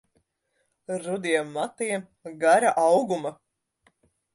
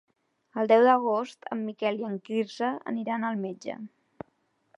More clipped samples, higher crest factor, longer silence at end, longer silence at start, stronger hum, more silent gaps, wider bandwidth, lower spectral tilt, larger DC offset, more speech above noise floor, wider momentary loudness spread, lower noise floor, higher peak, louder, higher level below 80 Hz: neither; about the same, 20 dB vs 20 dB; about the same, 1 s vs 0.9 s; first, 0.9 s vs 0.55 s; neither; neither; about the same, 11.5 kHz vs 10.5 kHz; second, -4 dB/octave vs -6 dB/octave; neither; first, 50 dB vs 45 dB; second, 14 LU vs 26 LU; about the same, -75 dBFS vs -72 dBFS; about the same, -8 dBFS vs -8 dBFS; first, -24 LUFS vs -27 LUFS; about the same, -76 dBFS vs -80 dBFS